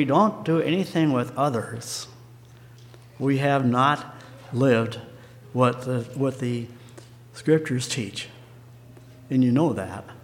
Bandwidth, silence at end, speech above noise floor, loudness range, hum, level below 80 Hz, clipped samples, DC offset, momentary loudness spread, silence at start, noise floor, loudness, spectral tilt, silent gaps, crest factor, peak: 16 kHz; 0.05 s; 24 dB; 4 LU; none; -64 dBFS; under 0.1%; under 0.1%; 18 LU; 0 s; -47 dBFS; -24 LUFS; -6 dB/octave; none; 20 dB; -4 dBFS